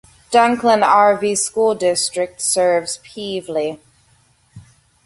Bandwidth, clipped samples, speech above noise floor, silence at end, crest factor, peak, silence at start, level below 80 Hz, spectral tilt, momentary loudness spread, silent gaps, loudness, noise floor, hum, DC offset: 12 kHz; under 0.1%; 40 dB; 0.45 s; 18 dB; 0 dBFS; 0.3 s; -60 dBFS; -2.5 dB/octave; 13 LU; none; -17 LUFS; -56 dBFS; none; under 0.1%